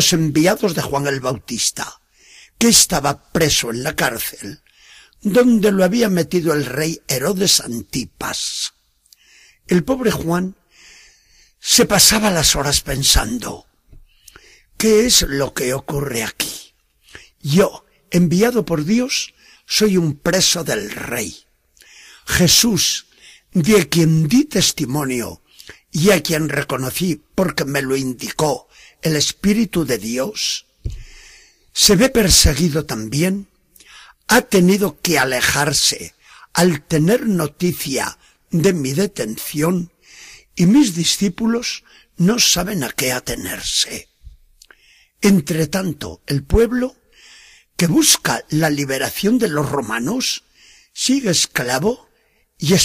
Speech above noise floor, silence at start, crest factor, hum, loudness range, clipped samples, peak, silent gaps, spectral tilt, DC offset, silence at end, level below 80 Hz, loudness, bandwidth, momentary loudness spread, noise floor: 43 dB; 0 s; 18 dB; none; 5 LU; under 0.1%; 0 dBFS; none; -3.5 dB/octave; under 0.1%; 0 s; -36 dBFS; -17 LUFS; 15.5 kHz; 12 LU; -60 dBFS